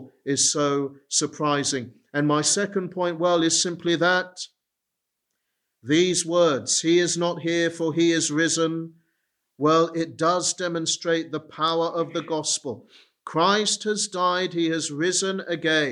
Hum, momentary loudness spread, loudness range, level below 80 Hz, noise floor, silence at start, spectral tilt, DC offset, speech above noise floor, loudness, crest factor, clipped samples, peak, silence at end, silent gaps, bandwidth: none; 8 LU; 3 LU; -72 dBFS; -82 dBFS; 0 s; -3 dB/octave; under 0.1%; 59 dB; -23 LUFS; 18 dB; under 0.1%; -6 dBFS; 0 s; none; 12 kHz